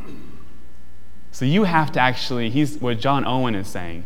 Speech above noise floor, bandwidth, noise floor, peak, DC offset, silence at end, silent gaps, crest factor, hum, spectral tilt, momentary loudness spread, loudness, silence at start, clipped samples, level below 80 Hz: 26 dB; 17 kHz; -47 dBFS; -2 dBFS; 7%; 0 s; none; 22 dB; none; -6 dB/octave; 15 LU; -21 LUFS; 0 s; under 0.1%; -48 dBFS